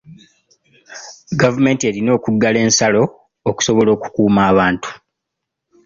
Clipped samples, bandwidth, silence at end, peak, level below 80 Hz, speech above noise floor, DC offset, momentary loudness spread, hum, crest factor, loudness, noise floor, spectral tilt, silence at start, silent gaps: under 0.1%; 7.8 kHz; 0.9 s; -2 dBFS; -48 dBFS; 65 dB; under 0.1%; 12 LU; none; 14 dB; -15 LUFS; -79 dBFS; -4.5 dB/octave; 0.1 s; none